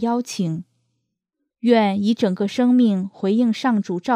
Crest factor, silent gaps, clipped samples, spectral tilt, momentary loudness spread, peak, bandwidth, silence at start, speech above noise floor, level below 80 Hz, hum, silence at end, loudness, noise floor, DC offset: 16 dB; none; under 0.1%; -6.5 dB/octave; 8 LU; -4 dBFS; 10.5 kHz; 0 s; 60 dB; -72 dBFS; none; 0 s; -20 LUFS; -78 dBFS; under 0.1%